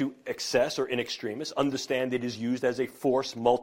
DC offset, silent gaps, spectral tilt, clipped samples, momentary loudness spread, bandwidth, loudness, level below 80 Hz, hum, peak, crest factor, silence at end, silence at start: under 0.1%; none; -4.5 dB/octave; under 0.1%; 6 LU; 16.5 kHz; -29 LUFS; -66 dBFS; none; -10 dBFS; 20 dB; 0 s; 0 s